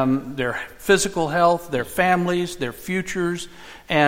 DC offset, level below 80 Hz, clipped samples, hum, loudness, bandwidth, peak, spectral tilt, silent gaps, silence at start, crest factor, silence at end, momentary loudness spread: 0.3%; -48 dBFS; under 0.1%; none; -22 LUFS; 16.5 kHz; -2 dBFS; -4.5 dB/octave; none; 0 s; 20 dB; 0 s; 10 LU